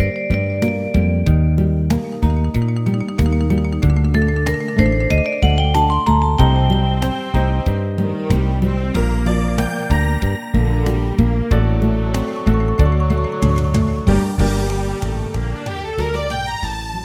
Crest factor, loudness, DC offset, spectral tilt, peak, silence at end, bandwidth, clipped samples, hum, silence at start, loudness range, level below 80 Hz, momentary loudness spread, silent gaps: 16 dB; -18 LUFS; under 0.1%; -7 dB/octave; 0 dBFS; 0 s; 16 kHz; under 0.1%; none; 0 s; 3 LU; -22 dBFS; 6 LU; none